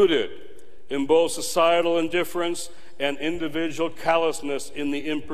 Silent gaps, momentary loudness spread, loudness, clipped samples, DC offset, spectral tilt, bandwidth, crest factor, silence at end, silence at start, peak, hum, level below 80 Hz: none; 10 LU; -24 LUFS; under 0.1%; 3%; -3.5 dB/octave; 14.5 kHz; 18 dB; 0 s; 0 s; -6 dBFS; none; -58 dBFS